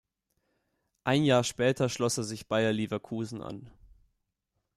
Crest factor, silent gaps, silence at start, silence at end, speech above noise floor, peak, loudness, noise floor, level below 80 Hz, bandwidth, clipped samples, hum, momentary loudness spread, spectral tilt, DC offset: 20 dB; none; 1.05 s; 0.9 s; 53 dB; -12 dBFS; -29 LUFS; -82 dBFS; -64 dBFS; 14.5 kHz; under 0.1%; none; 14 LU; -5 dB/octave; under 0.1%